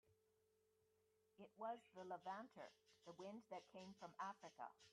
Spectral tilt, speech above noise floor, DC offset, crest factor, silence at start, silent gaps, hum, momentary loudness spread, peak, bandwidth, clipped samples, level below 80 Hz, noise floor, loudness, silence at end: -5 dB/octave; 27 dB; under 0.1%; 20 dB; 0.05 s; none; none; 11 LU; -38 dBFS; 10.5 kHz; under 0.1%; under -90 dBFS; -84 dBFS; -57 LUFS; 0 s